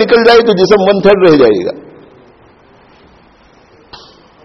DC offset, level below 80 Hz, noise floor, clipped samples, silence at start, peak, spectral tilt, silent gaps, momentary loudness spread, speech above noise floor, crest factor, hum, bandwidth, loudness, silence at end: under 0.1%; -44 dBFS; -44 dBFS; 0.2%; 0 s; 0 dBFS; -6 dB/octave; none; 11 LU; 37 dB; 10 dB; none; 6.4 kHz; -8 LUFS; 2.65 s